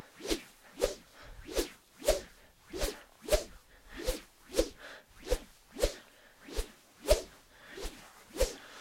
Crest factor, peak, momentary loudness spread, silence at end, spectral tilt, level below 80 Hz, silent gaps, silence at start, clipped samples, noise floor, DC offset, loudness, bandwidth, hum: 26 dB; -12 dBFS; 18 LU; 0 s; -3.5 dB/octave; -42 dBFS; none; 0 s; under 0.1%; -57 dBFS; under 0.1%; -36 LUFS; 16.5 kHz; none